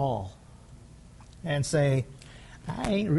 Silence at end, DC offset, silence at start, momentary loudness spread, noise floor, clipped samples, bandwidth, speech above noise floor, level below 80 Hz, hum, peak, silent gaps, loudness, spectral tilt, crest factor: 0 s; under 0.1%; 0 s; 26 LU; -50 dBFS; under 0.1%; 11.5 kHz; 23 dB; -50 dBFS; none; -14 dBFS; none; -29 LUFS; -6 dB/octave; 16 dB